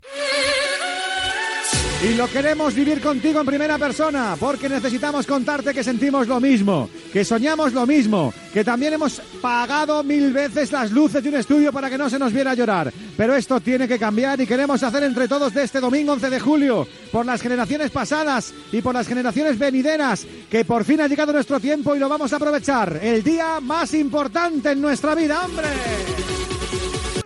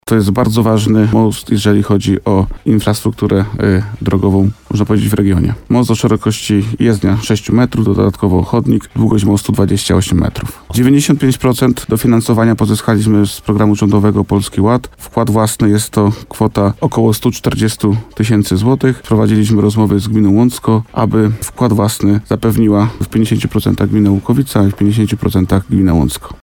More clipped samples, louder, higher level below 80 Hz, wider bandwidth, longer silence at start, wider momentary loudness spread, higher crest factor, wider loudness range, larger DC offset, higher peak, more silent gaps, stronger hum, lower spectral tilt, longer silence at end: neither; second, -20 LUFS vs -12 LUFS; second, -44 dBFS vs -32 dBFS; second, 12 kHz vs 19 kHz; about the same, 0.05 s vs 0.05 s; about the same, 5 LU vs 4 LU; about the same, 14 dB vs 12 dB; about the same, 2 LU vs 1 LU; neither; second, -6 dBFS vs 0 dBFS; neither; neither; second, -4.5 dB/octave vs -6.5 dB/octave; about the same, 0 s vs 0.05 s